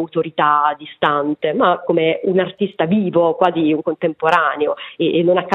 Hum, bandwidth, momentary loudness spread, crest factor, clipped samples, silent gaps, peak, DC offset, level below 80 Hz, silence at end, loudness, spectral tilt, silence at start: none; 7.4 kHz; 6 LU; 16 dB; under 0.1%; none; 0 dBFS; under 0.1%; -64 dBFS; 0 s; -17 LUFS; -7.5 dB/octave; 0 s